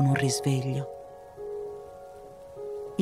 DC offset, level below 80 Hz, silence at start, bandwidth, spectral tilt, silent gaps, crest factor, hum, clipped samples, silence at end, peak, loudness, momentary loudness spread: under 0.1%; -62 dBFS; 0 s; 14.5 kHz; -5.5 dB/octave; none; 16 dB; none; under 0.1%; 0 s; -14 dBFS; -31 LUFS; 20 LU